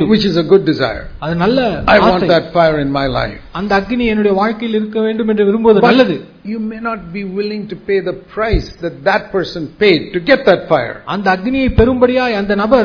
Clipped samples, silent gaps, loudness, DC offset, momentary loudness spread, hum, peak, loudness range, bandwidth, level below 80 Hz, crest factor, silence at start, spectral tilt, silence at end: 0.2%; none; -14 LUFS; under 0.1%; 12 LU; none; 0 dBFS; 4 LU; 5.4 kHz; -30 dBFS; 14 dB; 0 s; -7.5 dB/octave; 0 s